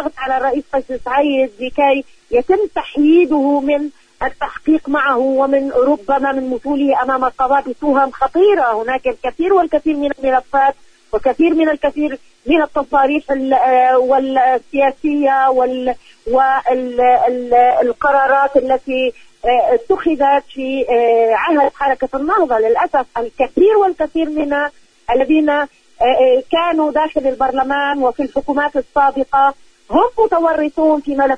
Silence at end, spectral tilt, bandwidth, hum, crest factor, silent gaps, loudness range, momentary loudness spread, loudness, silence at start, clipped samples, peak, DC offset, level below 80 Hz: 0 s; -5.5 dB/octave; 9.6 kHz; none; 14 dB; none; 2 LU; 7 LU; -15 LUFS; 0 s; under 0.1%; 0 dBFS; under 0.1%; -44 dBFS